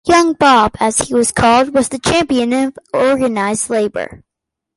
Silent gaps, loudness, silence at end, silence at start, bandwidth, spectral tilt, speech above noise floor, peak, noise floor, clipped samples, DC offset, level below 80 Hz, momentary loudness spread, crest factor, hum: none; -13 LUFS; 0.6 s; 0.05 s; 12 kHz; -3.5 dB/octave; 68 dB; 0 dBFS; -81 dBFS; under 0.1%; under 0.1%; -40 dBFS; 8 LU; 14 dB; none